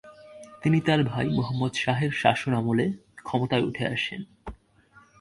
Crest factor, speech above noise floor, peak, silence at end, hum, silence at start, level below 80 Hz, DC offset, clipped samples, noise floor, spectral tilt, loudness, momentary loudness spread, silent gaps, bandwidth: 22 dB; 32 dB; -4 dBFS; 0.65 s; none; 0.05 s; -54 dBFS; under 0.1%; under 0.1%; -57 dBFS; -6.5 dB/octave; -26 LUFS; 18 LU; none; 11.5 kHz